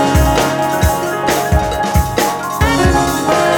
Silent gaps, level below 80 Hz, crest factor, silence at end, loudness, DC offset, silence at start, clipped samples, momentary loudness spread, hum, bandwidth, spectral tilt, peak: none; -22 dBFS; 12 dB; 0 s; -14 LUFS; under 0.1%; 0 s; under 0.1%; 4 LU; none; 19.5 kHz; -5 dB/octave; 0 dBFS